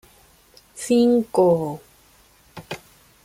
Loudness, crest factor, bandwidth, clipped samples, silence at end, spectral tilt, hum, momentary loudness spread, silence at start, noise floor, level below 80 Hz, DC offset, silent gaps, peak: -19 LUFS; 18 dB; 16 kHz; under 0.1%; 0.5 s; -6 dB/octave; none; 20 LU; 0.75 s; -55 dBFS; -60 dBFS; under 0.1%; none; -6 dBFS